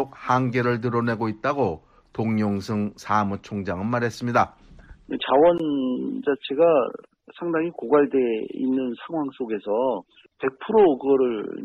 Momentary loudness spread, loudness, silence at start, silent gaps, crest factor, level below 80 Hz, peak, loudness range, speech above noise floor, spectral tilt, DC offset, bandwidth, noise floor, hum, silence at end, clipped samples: 11 LU; -23 LUFS; 0 s; none; 16 dB; -58 dBFS; -8 dBFS; 3 LU; 25 dB; -7.5 dB/octave; under 0.1%; 11.5 kHz; -47 dBFS; none; 0 s; under 0.1%